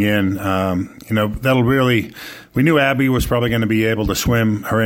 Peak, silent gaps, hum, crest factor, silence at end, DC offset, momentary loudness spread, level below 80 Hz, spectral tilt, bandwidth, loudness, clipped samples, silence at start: -2 dBFS; none; none; 14 dB; 0 s; under 0.1%; 7 LU; -34 dBFS; -6 dB/octave; 17 kHz; -17 LUFS; under 0.1%; 0 s